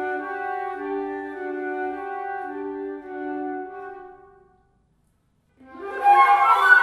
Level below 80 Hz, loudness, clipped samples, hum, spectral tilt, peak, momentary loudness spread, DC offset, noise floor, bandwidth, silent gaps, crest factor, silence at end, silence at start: -66 dBFS; -23 LUFS; under 0.1%; none; -3 dB/octave; -2 dBFS; 19 LU; under 0.1%; -66 dBFS; 13 kHz; none; 20 dB; 0 s; 0 s